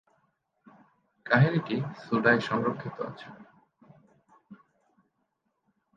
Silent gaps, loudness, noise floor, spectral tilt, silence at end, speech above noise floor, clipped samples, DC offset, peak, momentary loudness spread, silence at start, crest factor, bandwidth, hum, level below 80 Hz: none; -27 LUFS; -78 dBFS; -8 dB/octave; 1.4 s; 51 dB; under 0.1%; under 0.1%; -8 dBFS; 21 LU; 1.25 s; 24 dB; 7.4 kHz; none; -70 dBFS